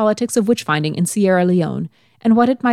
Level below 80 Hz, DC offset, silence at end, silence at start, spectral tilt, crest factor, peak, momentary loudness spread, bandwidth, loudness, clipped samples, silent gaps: -62 dBFS; under 0.1%; 0 s; 0 s; -5.5 dB/octave; 14 dB; -2 dBFS; 8 LU; 14.5 kHz; -17 LUFS; under 0.1%; none